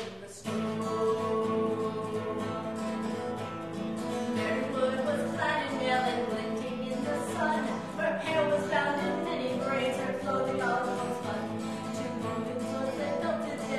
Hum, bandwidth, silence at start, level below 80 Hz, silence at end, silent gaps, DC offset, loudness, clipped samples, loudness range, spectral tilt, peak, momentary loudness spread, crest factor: none; 13 kHz; 0 s; -66 dBFS; 0 s; none; 0.1%; -31 LUFS; under 0.1%; 3 LU; -5.5 dB/octave; -14 dBFS; 7 LU; 18 dB